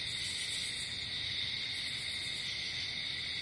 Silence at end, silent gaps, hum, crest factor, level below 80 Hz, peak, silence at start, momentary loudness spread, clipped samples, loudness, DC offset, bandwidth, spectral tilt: 0 s; none; none; 12 dB; -62 dBFS; -26 dBFS; 0 s; 1 LU; under 0.1%; -35 LUFS; under 0.1%; 11.5 kHz; -0.5 dB/octave